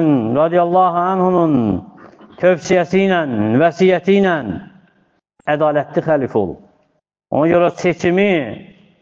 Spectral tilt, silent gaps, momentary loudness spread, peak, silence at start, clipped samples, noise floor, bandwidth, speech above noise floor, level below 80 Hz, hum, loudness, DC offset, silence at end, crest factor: -7 dB/octave; none; 9 LU; -2 dBFS; 0 s; under 0.1%; -60 dBFS; 7.6 kHz; 46 dB; -52 dBFS; none; -15 LUFS; under 0.1%; 0.4 s; 14 dB